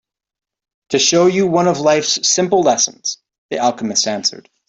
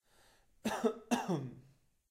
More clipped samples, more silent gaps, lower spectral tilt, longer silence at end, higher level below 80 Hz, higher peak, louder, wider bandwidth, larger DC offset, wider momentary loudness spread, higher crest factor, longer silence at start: neither; first, 3.38-3.49 s vs none; second, -3 dB/octave vs -5.5 dB/octave; second, 0.3 s vs 0.5 s; first, -60 dBFS vs -72 dBFS; first, 0 dBFS vs -18 dBFS; first, -15 LUFS vs -37 LUFS; second, 8.4 kHz vs 16 kHz; neither; about the same, 9 LU vs 8 LU; second, 16 dB vs 22 dB; first, 0.9 s vs 0.65 s